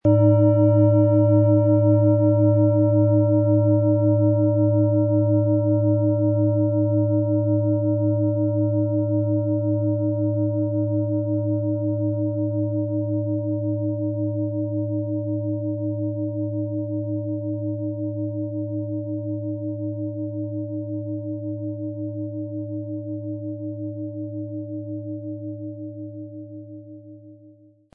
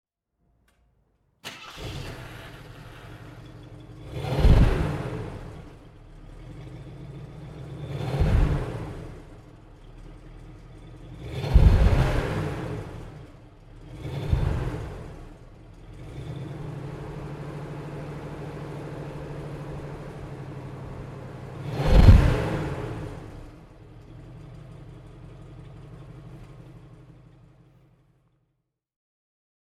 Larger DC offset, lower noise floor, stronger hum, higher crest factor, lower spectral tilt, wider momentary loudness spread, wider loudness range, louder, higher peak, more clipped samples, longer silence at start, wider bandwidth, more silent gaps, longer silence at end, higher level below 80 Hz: neither; second, -51 dBFS vs -78 dBFS; neither; second, 16 dB vs 26 dB; first, -15.5 dB/octave vs -7.5 dB/octave; second, 14 LU vs 26 LU; second, 13 LU vs 21 LU; first, -22 LUFS vs -27 LUFS; second, -6 dBFS vs 0 dBFS; neither; second, 0.05 s vs 1.45 s; second, 1.4 kHz vs 12.5 kHz; neither; second, 0.45 s vs 2.65 s; second, -64 dBFS vs -30 dBFS